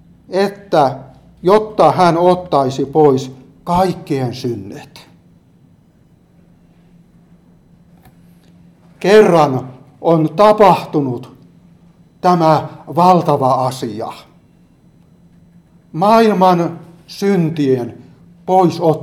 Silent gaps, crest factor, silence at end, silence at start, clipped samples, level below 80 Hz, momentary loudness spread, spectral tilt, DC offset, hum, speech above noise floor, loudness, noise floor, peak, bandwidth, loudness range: none; 16 dB; 0 s; 0.3 s; under 0.1%; -50 dBFS; 17 LU; -7 dB/octave; under 0.1%; none; 37 dB; -14 LUFS; -50 dBFS; 0 dBFS; 15.5 kHz; 9 LU